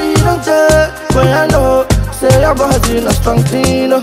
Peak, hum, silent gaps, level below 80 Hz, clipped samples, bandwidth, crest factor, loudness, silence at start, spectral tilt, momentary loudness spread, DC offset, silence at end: 0 dBFS; none; none; -20 dBFS; under 0.1%; 16.5 kHz; 10 dB; -11 LUFS; 0 s; -5.5 dB/octave; 3 LU; under 0.1%; 0 s